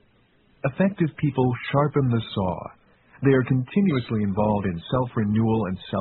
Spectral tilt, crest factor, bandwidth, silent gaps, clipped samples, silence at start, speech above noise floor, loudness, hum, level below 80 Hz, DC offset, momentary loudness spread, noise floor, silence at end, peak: -7 dB/octave; 16 dB; 4.3 kHz; none; under 0.1%; 0.65 s; 38 dB; -24 LUFS; none; -50 dBFS; under 0.1%; 6 LU; -60 dBFS; 0 s; -6 dBFS